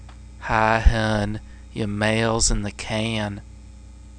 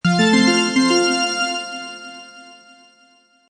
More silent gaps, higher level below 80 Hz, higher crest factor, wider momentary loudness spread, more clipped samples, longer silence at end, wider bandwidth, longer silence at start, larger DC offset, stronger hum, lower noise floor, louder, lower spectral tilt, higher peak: neither; first, -28 dBFS vs -62 dBFS; first, 22 dB vs 16 dB; second, 15 LU vs 20 LU; neither; second, 0 s vs 1 s; about the same, 10.5 kHz vs 11 kHz; about the same, 0 s vs 0.05 s; neither; neither; second, -42 dBFS vs -55 dBFS; second, -22 LUFS vs -16 LUFS; about the same, -4 dB/octave vs -4 dB/octave; about the same, -2 dBFS vs -4 dBFS